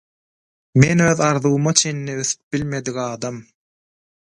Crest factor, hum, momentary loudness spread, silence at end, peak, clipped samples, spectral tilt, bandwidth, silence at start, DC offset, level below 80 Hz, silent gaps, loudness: 20 dB; none; 11 LU; 0.9 s; 0 dBFS; under 0.1%; -4.5 dB/octave; 11 kHz; 0.75 s; under 0.1%; -50 dBFS; 2.43-2.51 s; -18 LUFS